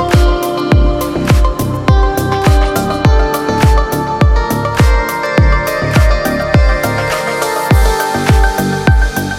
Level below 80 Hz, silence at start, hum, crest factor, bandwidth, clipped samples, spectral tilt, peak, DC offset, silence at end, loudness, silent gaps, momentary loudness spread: -14 dBFS; 0 s; none; 10 dB; 16.5 kHz; under 0.1%; -6 dB/octave; 0 dBFS; under 0.1%; 0 s; -12 LUFS; none; 4 LU